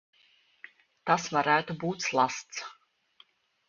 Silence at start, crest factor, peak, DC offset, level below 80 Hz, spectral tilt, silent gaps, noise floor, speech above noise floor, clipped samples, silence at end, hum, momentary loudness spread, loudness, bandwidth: 1.05 s; 22 dB; -8 dBFS; under 0.1%; -74 dBFS; -3.5 dB/octave; none; -65 dBFS; 37 dB; under 0.1%; 0.95 s; none; 14 LU; -29 LUFS; 7.4 kHz